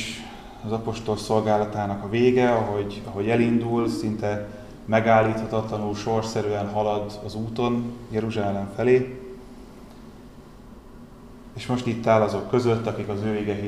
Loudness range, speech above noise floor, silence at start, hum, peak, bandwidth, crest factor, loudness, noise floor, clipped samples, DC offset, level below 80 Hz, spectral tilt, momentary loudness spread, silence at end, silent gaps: 5 LU; 21 dB; 0 s; none; -6 dBFS; 13.5 kHz; 18 dB; -24 LUFS; -44 dBFS; under 0.1%; 0.1%; -48 dBFS; -6.5 dB/octave; 19 LU; 0 s; none